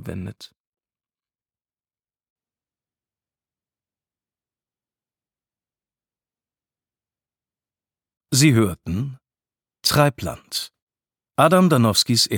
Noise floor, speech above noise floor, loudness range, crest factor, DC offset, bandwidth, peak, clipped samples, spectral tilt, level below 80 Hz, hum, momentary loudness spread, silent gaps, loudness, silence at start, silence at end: under -90 dBFS; over 71 dB; 5 LU; 22 dB; under 0.1%; 19 kHz; -2 dBFS; under 0.1%; -4.5 dB/octave; -54 dBFS; none; 17 LU; 0.60-0.72 s, 2.30-2.36 s, 10.82-10.87 s; -19 LUFS; 0 s; 0 s